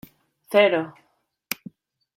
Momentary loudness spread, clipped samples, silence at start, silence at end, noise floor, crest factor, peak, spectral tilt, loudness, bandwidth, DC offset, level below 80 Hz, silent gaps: 15 LU; under 0.1%; 0.5 s; 0.6 s; -46 dBFS; 22 dB; -4 dBFS; -4 dB/octave; -22 LUFS; 16.5 kHz; under 0.1%; -72 dBFS; none